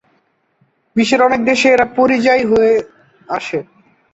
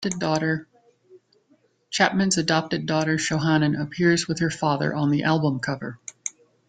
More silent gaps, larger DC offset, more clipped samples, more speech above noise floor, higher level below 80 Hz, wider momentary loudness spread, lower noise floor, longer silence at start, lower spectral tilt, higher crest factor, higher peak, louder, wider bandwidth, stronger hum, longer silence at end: neither; neither; neither; first, 48 dB vs 40 dB; first, -52 dBFS vs -60 dBFS; about the same, 12 LU vs 11 LU; about the same, -61 dBFS vs -63 dBFS; first, 0.95 s vs 0 s; about the same, -4.5 dB/octave vs -4.5 dB/octave; second, 14 dB vs 22 dB; about the same, -2 dBFS vs -2 dBFS; first, -14 LUFS vs -23 LUFS; second, 8.2 kHz vs 9.6 kHz; neither; about the same, 0.5 s vs 0.4 s